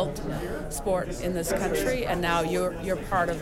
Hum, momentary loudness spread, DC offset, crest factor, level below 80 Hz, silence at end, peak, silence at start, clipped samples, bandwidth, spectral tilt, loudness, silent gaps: none; 7 LU; under 0.1%; 14 dB; -40 dBFS; 0 s; -14 dBFS; 0 s; under 0.1%; 17 kHz; -5 dB/octave; -28 LUFS; none